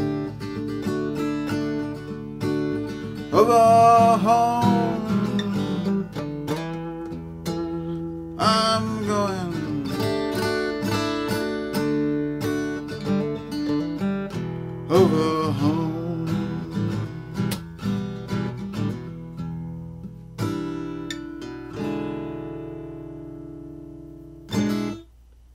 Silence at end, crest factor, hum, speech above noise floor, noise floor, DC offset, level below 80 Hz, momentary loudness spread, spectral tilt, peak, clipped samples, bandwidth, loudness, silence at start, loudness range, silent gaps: 0.5 s; 20 dB; none; 35 dB; -50 dBFS; under 0.1%; -50 dBFS; 16 LU; -6.5 dB/octave; -4 dBFS; under 0.1%; 16 kHz; -24 LUFS; 0 s; 13 LU; none